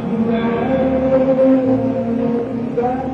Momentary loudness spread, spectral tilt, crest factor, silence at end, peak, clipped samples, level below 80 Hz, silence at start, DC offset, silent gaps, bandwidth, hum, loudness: 6 LU; -9.5 dB/octave; 12 dB; 0 s; -4 dBFS; under 0.1%; -40 dBFS; 0 s; under 0.1%; none; 6 kHz; none; -17 LUFS